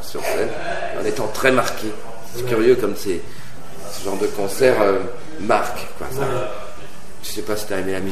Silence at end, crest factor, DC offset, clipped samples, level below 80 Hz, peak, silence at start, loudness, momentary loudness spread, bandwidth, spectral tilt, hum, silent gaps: 0 s; 22 dB; 8%; under 0.1%; -46 dBFS; 0 dBFS; 0 s; -21 LUFS; 18 LU; 14 kHz; -4.5 dB/octave; none; none